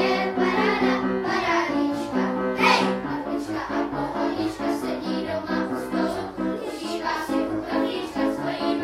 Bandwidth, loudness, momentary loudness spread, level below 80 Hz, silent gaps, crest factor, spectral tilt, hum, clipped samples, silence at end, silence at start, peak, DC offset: 15.5 kHz; -25 LUFS; 7 LU; -52 dBFS; none; 20 dB; -5 dB/octave; none; under 0.1%; 0 s; 0 s; -6 dBFS; under 0.1%